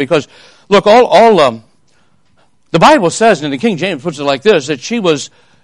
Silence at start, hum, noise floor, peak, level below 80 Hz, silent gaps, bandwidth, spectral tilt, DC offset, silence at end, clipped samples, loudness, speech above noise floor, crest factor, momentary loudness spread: 0 s; none; -55 dBFS; 0 dBFS; -48 dBFS; none; 11.5 kHz; -4.5 dB/octave; under 0.1%; 0.35 s; 0.4%; -10 LUFS; 45 dB; 12 dB; 11 LU